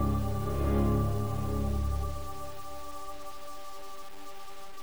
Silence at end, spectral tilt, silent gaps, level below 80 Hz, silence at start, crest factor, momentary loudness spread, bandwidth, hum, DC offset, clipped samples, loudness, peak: 0 s; -7 dB/octave; none; -38 dBFS; 0 s; 16 dB; 18 LU; over 20 kHz; none; 1%; under 0.1%; -33 LUFS; -16 dBFS